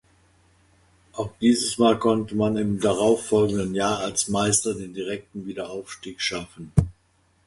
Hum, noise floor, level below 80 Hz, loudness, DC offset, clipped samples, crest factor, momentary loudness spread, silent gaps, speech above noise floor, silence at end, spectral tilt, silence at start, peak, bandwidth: none; -64 dBFS; -46 dBFS; -23 LUFS; under 0.1%; under 0.1%; 22 dB; 13 LU; none; 41 dB; 0.55 s; -4.5 dB/octave; 1.15 s; -2 dBFS; 11.5 kHz